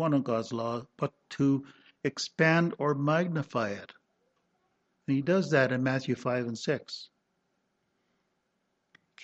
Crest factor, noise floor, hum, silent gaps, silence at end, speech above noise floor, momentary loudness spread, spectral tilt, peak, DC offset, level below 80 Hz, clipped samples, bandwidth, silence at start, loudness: 22 dB; -78 dBFS; none; none; 0 s; 49 dB; 11 LU; -6 dB/octave; -10 dBFS; under 0.1%; -74 dBFS; under 0.1%; 8.2 kHz; 0 s; -29 LUFS